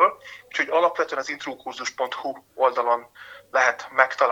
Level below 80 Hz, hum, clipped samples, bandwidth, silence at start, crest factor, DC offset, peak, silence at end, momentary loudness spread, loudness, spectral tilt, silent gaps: -74 dBFS; none; under 0.1%; 16.5 kHz; 0 s; 22 dB; under 0.1%; -2 dBFS; 0 s; 12 LU; -24 LUFS; -1.5 dB/octave; none